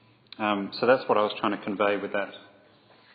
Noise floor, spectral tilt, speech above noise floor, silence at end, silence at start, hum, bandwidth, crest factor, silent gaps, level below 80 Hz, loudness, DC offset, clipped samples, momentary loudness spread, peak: -57 dBFS; -8.5 dB/octave; 31 dB; 0.75 s; 0.4 s; none; 5 kHz; 20 dB; none; -76 dBFS; -26 LUFS; under 0.1%; under 0.1%; 9 LU; -8 dBFS